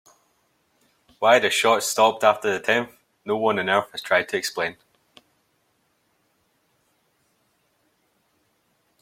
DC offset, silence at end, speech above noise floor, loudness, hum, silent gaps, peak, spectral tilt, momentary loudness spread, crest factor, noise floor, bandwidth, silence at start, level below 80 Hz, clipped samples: under 0.1%; 4.3 s; 47 dB; -21 LUFS; none; none; -2 dBFS; -2.5 dB/octave; 11 LU; 24 dB; -68 dBFS; 16.5 kHz; 1.2 s; -72 dBFS; under 0.1%